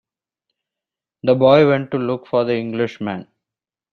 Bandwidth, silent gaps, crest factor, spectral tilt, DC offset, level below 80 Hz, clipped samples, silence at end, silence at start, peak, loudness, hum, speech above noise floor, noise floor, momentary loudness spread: 6.6 kHz; none; 18 dB; -8.5 dB/octave; under 0.1%; -60 dBFS; under 0.1%; 0.7 s; 1.25 s; -2 dBFS; -17 LUFS; none; 72 dB; -88 dBFS; 14 LU